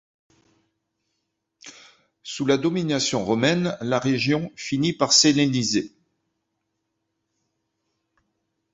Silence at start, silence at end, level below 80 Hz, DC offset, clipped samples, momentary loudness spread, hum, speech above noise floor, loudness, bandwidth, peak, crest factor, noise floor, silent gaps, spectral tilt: 1.65 s; 2.85 s; -62 dBFS; under 0.1%; under 0.1%; 12 LU; none; 56 dB; -21 LUFS; 8 kHz; -4 dBFS; 22 dB; -78 dBFS; none; -4 dB/octave